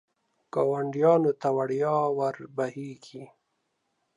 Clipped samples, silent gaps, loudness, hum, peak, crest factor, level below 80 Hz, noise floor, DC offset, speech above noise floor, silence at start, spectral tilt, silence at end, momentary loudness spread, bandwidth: under 0.1%; none; -26 LUFS; none; -8 dBFS; 20 dB; -80 dBFS; -77 dBFS; under 0.1%; 51 dB; 0.55 s; -8 dB/octave; 0.9 s; 19 LU; 10.5 kHz